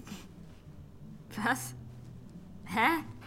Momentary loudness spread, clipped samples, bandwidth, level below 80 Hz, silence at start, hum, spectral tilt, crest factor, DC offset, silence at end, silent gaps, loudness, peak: 24 LU; under 0.1%; 16.5 kHz; -60 dBFS; 0 s; none; -4 dB/octave; 24 dB; under 0.1%; 0 s; none; -32 LUFS; -12 dBFS